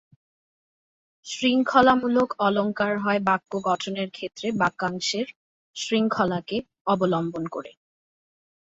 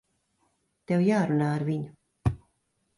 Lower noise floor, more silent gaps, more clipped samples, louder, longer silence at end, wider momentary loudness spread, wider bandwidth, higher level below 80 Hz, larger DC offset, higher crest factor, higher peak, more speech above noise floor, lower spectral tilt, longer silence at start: first, under -90 dBFS vs -74 dBFS; first, 5.36-5.74 s, 6.81-6.85 s vs none; neither; first, -24 LUFS vs -27 LUFS; first, 1 s vs 0.6 s; about the same, 14 LU vs 13 LU; second, 8 kHz vs 11.5 kHz; second, -64 dBFS vs -48 dBFS; neither; first, 22 dB vs 16 dB; first, -4 dBFS vs -12 dBFS; first, over 66 dB vs 49 dB; second, -5 dB/octave vs -8.5 dB/octave; first, 1.25 s vs 0.9 s